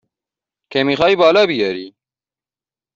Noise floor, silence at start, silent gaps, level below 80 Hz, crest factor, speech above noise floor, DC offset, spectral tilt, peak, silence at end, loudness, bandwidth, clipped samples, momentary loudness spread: under -90 dBFS; 0.7 s; none; -56 dBFS; 16 dB; over 76 dB; under 0.1%; -5.5 dB/octave; -2 dBFS; 1.05 s; -15 LUFS; 7.6 kHz; under 0.1%; 11 LU